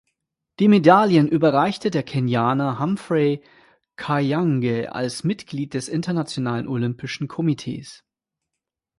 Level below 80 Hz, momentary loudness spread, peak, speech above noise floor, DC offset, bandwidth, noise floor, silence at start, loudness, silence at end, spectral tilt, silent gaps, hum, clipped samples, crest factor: -60 dBFS; 13 LU; 0 dBFS; 64 dB; under 0.1%; 11.5 kHz; -84 dBFS; 0.6 s; -21 LUFS; 1.05 s; -7 dB/octave; none; none; under 0.1%; 20 dB